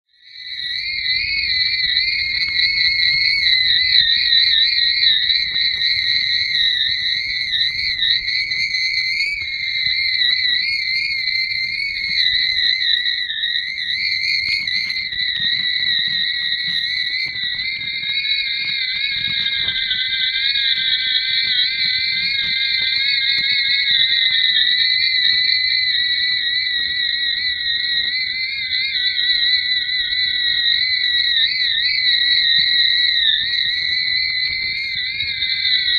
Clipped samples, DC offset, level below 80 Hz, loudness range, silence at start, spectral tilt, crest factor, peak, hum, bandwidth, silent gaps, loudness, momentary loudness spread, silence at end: under 0.1%; under 0.1%; -50 dBFS; 4 LU; 0.35 s; 0 dB/octave; 18 dB; 0 dBFS; none; 13 kHz; none; -15 LUFS; 7 LU; 0 s